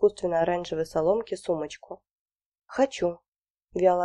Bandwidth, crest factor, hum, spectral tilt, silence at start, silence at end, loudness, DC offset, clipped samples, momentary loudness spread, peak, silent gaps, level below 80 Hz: 11.5 kHz; 18 dB; none; -5.5 dB/octave; 0 s; 0 s; -27 LUFS; under 0.1%; under 0.1%; 18 LU; -8 dBFS; 2.19-2.26 s, 2.45-2.52 s, 3.28-3.32 s, 3.50-3.55 s; -60 dBFS